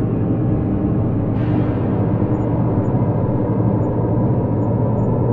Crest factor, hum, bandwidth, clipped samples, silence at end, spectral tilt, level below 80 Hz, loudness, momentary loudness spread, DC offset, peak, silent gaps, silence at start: 12 dB; none; 3.4 kHz; under 0.1%; 0 s; -12.5 dB/octave; -34 dBFS; -18 LUFS; 1 LU; 0.6%; -4 dBFS; none; 0 s